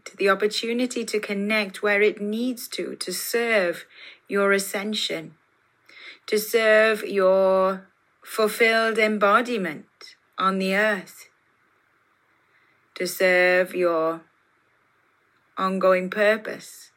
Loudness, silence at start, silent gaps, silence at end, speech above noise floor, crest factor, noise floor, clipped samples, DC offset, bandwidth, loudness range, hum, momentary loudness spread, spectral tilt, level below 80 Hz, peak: -22 LUFS; 0.05 s; none; 0.1 s; 42 dB; 18 dB; -65 dBFS; under 0.1%; under 0.1%; 16.5 kHz; 5 LU; none; 14 LU; -4 dB/octave; -86 dBFS; -6 dBFS